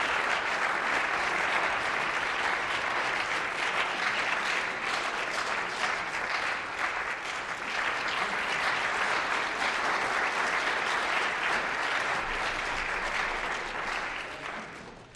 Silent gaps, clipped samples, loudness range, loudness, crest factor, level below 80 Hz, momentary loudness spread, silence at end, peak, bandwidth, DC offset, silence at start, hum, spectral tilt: none; under 0.1%; 3 LU; -29 LUFS; 16 dB; -54 dBFS; 5 LU; 0 s; -14 dBFS; 13 kHz; under 0.1%; 0 s; none; -1.5 dB/octave